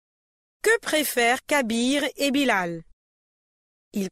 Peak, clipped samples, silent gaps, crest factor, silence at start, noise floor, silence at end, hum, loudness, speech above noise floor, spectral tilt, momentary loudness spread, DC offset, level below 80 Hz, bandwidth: -8 dBFS; under 0.1%; 2.93-3.91 s; 18 dB; 0.65 s; under -90 dBFS; 0 s; none; -23 LUFS; over 67 dB; -3 dB/octave; 11 LU; under 0.1%; -60 dBFS; 16 kHz